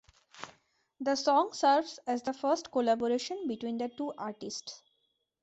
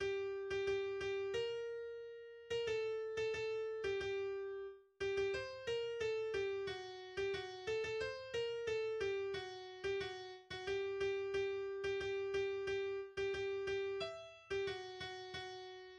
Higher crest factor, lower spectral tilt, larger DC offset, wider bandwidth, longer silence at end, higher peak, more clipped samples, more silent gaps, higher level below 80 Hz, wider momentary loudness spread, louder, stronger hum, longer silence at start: first, 18 dB vs 12 dB; about the same, -3 dB/octave vs -4 dB/octave; neither; second, 8.2 kHz vs 9.4 kHz; first, 0.65 s vs 0 s; first, -14 dBFS vs -30 dBFS; neither; neither; second, -76 dBFS vs -68 dBFS; first, 20 LU vs 8 LU; first, -31 LUFS vs -42 LUFS; neither; first, 0.35 s vs 0 s